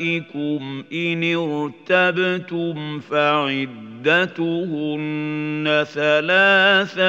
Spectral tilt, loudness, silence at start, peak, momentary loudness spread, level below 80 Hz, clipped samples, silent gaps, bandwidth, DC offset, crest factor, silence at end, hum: -6 dB/octave; -19 LUFS; 0 s; -2 dBFS; 12 LU; -74 dBFS; under 0.1%; none; 7.8 kHz; under 0.1%; 18 dB; 0 s; none